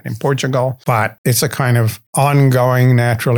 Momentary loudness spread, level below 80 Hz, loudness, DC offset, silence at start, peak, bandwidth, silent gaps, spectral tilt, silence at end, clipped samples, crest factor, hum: 6 LU; -54 dBFS; -14 LUFS; under 0.1%; 0.05 s; -2 dBFS; 19.5 kHz; 1.18-1.24 s, 2.07-2.13 s; -5.5 dB/octave; 0 s; under 0.1%; 12 dB; none